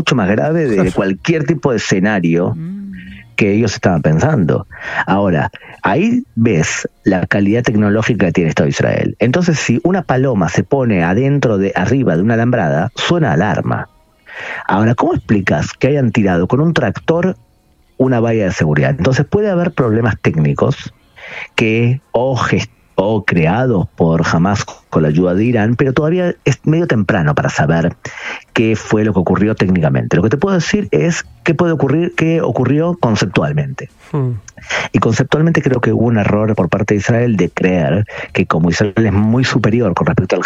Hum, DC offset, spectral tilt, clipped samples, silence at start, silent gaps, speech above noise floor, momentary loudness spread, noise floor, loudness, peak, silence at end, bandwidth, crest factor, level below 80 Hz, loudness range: none; under 0.1%; -6.5 dB/octave; under 0.1%; 0 s; none; 39 dB; 6 LU; -52 dBFS; -14 LUFS; 0 dBFS; 0 s; 8.6 kHz; 12 dB; -40 dBFS; 2 LU